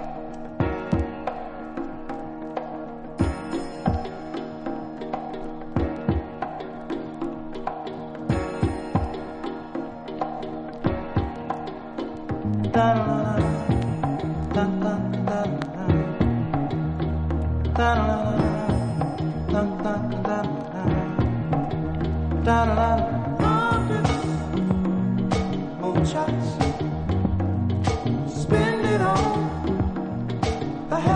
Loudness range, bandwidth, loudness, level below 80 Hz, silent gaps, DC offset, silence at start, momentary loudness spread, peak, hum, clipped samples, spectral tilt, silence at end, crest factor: 7 LU; 10.5 kHz; -25 LUFS; -36 dBFS; none; under 0.1%; 0 s; 12 LU; -6 dBFS; none; under 0.1%; -7.5 dB/octave; 0 s; 20 dB